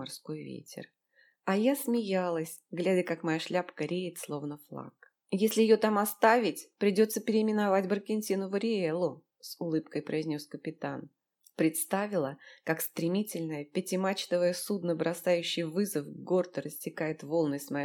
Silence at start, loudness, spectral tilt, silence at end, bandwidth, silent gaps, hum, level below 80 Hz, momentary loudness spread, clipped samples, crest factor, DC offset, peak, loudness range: 0 s; -31 LUFS; -5 dB/octave; 0 s; 19 kHz; none; none; -84 dBFS; 14 LU; under 0.1%; 22 dB; under 0.1%; -10 dBFS; 6 LU